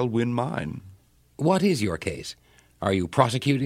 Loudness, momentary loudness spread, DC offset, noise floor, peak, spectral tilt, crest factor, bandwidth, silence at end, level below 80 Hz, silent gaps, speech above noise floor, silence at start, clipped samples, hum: -25 LUFS; 15 LU; under 0.1%; -54 dBFS; -2 dBFS; -6 dB/octave; 24 dB; 15.5 kHz; 0 s; -54 dBFS; none; 30 dB; 0 s; under 0.1%; none